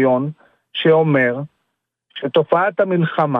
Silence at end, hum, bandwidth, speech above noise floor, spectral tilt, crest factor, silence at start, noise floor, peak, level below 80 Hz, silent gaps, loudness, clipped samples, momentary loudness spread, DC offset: 0 s; none; 4.3 kHz; 58 dB; -9 dB/octave; 16 dB; 0 s; -74 dBFS; -2 dBFS; -68 dBFS; none; -17 LUFS; under 0.1%; 14 LU; under 0.1%